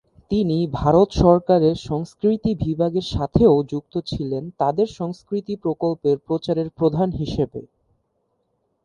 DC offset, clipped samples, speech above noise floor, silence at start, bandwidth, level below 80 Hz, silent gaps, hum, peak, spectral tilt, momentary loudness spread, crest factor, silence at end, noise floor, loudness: under 0.1%; under 0.1%; 50 dB; 0.3 s; 9.4 kHz; -40 dBFS; none; none; -2 dBFS; -8.5 dB/octave; 11 LU; 20 dB; 1.2 s; -70 dBFS; -21 LUFS